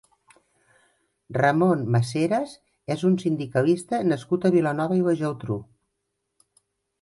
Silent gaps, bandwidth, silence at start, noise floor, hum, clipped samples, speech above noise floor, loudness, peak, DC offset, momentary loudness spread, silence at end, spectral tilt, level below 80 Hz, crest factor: none; 11.5 kHz; 1.3 s; -79 dBFS; none; under 0.1%; 56 dB; -24 LUFS; -6 dBFS; under 0.1%; 11 LU; 1.4 s; -7.5 dB/octave; -62 dBFS; 18 dB